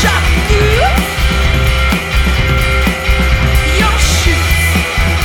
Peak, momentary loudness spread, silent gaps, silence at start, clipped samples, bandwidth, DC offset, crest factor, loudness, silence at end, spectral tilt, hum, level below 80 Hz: 0 dBFS; 3 LU; none; 0 s; under 0.1%; 18.5 kHz; under 0.1%; 10 dB; -12 LUFS; 0 s; -4.5 dB/octave; none; -14 dBFS